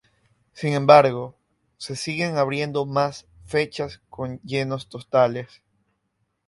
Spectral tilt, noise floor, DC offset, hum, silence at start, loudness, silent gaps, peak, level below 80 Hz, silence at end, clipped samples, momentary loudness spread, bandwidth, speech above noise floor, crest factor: -5.5 dB/octave; -74 dBFS; under 0.1%; none; 0.55 s; -22 LUFS; none; 0 dBFS; -58 dBFS; 1 s; under 0.1%; 19 LU; 11.5 kHz; 52 dB; 24 dB